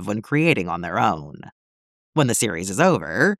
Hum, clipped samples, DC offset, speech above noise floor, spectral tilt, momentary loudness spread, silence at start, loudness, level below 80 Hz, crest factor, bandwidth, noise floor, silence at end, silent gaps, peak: none; under 0.1%; under 0.1%; over 69 dB; -4.5 dB/octave; 7 LU; 0 s; -21 LUFS; -56 dBFS; 18 dB; 16 kHz; under -90 dBFS; 0.05 s; 1.52-2.13 s; -4 dBFS